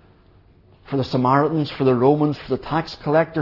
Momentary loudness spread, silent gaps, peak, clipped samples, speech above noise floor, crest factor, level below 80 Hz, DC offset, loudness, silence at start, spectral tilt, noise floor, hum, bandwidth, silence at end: 9 LU; none; -2 dBFS; under 0.1%; 33 dB; 18 dB; -50 dBFS; under 0.1%; -20 LUFS; 0.9 s; -8.5 dB/octave; -52 dBFS; none; 6 kHz; 0 s